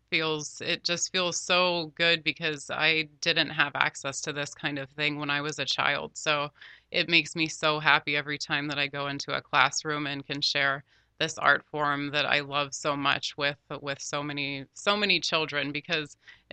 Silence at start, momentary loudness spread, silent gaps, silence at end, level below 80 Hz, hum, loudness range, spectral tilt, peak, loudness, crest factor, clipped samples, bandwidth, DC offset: 0.1 s; 9 LU; none; 0.2 s; -68 dBFS; none; 3 LU; -2.5 dB/octave; -2 dBFS; -27 LUFS; 26 dB; under 0.1%; 9.2 kHz; under 0.1%